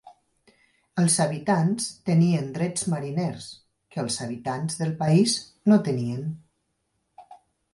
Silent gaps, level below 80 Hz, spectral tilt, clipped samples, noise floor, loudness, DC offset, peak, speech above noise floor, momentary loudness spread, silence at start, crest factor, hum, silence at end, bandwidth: none; -66 dBFS; -5.5 dB/octave; under 0.1%; -75 dBFS; -24 LUFS; under 0.1%; -8 dBFS; 51 dB; 12 LU; 0.05 s; 18 dB; none; 0.4 s; 11.5 kHz